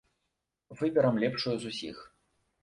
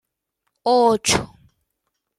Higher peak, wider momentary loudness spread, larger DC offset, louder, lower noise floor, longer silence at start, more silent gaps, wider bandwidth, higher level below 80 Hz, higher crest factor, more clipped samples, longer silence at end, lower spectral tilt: second, -14 dBFS vs -2 dBFS; first, 15 LU vs 12 LU; neither; second, -30 LUFS vs -18 LUFS; first, -84 dBFS vs -77 dBFS; about the same, 0.7 s vs 0.65 s; neither; second, 11 kHz vs 14 kHz; second, -68 dBFS vs -48 dBFS; about the same, 18 dB vs 20 dB; neither; second, 0.55 s vs 0.9 s; first, -6 dB/octave vs -3 dB/octave